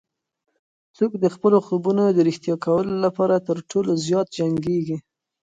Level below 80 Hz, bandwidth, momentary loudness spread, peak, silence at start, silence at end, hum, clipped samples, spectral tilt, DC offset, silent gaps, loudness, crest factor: -62 dBFS; 9.2 kHz; 7 LU; -4 dBFS; 1 s; 0.45 s; none; under 0.1%; -7 dB/octave; under 0.1%; none; -21 LUFS; 16 dB